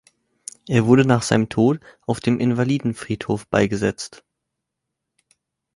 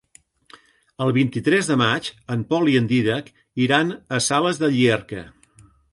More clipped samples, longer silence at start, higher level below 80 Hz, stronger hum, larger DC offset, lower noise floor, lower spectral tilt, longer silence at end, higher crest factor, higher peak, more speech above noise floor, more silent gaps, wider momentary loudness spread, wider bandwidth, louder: neither; second, 0.65 s vs 1 s; about the same, -52 dBFS vs -56 dBFS; neither; neither; first, -81 dBFS vs -54 dBFS; first, -6.5 dB/octave vs -5 dB/octave; first, 1.6 s vs 0.65 s; about the same, 20 dB vs 18 dB; about the same, -2 dBFS vs -2 dBFS; first, 62 dB vs 34 dB; neither; first, 17 LU vs 10 LU; about the same, 11.5 kHz vs 11.5 kHz; about the same, -20 LUFS vs -20 LUFS